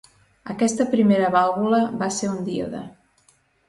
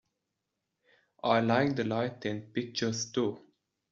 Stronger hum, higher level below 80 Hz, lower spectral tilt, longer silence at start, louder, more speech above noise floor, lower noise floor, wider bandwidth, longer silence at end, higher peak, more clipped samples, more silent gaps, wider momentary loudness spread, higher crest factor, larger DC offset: neither; first, -60 dBFS vs -70 dBFS; about the same, -5.5 dB/octave vs -4.5 dB/octave; second, 0.45 s vs 1.25 s; first, -21 LUFS vs -31 LUFS; second, 40 dB vs 55 dB; second, -61 dBFS vs -85 dBFS; first, 11.5 kHz vs 7.6 kHz; first, 0.8 s vs 0.55 s; first, -6 dBFS vs -12 dBFS; neither; neither; first, 17 LU vs 10 LU; second, 16 dB vs 22 dB; neither